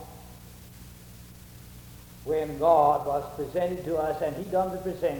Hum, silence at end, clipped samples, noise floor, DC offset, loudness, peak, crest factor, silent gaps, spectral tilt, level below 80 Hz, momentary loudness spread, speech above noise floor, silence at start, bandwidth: 60 Hz at -50 dBFS; 0 s; under 0.1%; -47 dBFS; under 0.1%; -27 LUFS; -10 dBFS; 20 dB; none; -6.5 dB/octave; -52 dBFS; 25 LU; 21 dB; 0 s; over 20 kHz